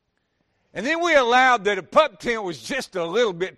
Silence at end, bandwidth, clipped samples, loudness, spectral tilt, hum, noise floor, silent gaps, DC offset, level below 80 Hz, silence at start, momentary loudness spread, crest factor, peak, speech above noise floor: 0.1 s; 13 kHz; under 0.1%; -20 LUFS; -3.5 dB/octave; none; -72 dBFS; none; under 0.1%; -56 dBFS; 0.75 s; 11 LU; 18 dB; -4 dBFS; 51 dB